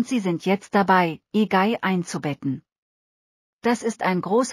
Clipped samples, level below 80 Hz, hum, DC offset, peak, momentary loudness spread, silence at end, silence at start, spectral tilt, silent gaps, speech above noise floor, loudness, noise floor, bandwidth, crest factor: under 0.1%; -68 dBFS; none; under 0.1%; -4 dBFS; 9 LU; 0 s; 0 s; -5.5 dB/octave; 2.78-3.59 s; over 68 dB; -23 LUFS; under -90 dBFS; 15 kHz; 18 dB